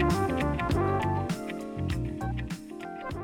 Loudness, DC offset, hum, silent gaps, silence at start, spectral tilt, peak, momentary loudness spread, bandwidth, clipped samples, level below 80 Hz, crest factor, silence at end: -31 LUFS; under 0.1%; none; none; 0 s; -7 dB/octave; -14 dBFS; 11 LU; 17.5 kHz; under 0.1%; -40 dBFS; 16 dB; 0 s